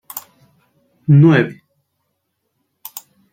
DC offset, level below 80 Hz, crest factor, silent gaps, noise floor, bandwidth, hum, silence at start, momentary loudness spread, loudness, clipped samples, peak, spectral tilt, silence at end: under 0.1%; -60 dBFS; 16 dB; none; -71 dBFS; 17 kHz; none; 0.15 s; 24 LU; -13 LUFS; under 0.1%; -2 dBFS; -7.5 dB/octave; 1.8 s